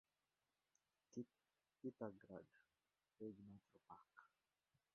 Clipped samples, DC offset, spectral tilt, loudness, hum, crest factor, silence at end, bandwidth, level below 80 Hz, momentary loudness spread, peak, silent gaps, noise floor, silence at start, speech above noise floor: under 0.1%; under 0.1%; -8 dB/octave; -59 LUFS; none; 26 dB; 0.65 s; 6.4 kHz; under -90 dBFS; 13 LU; -36 dBFS; none; under -90 dBFS; 1.1 s; over 32 dB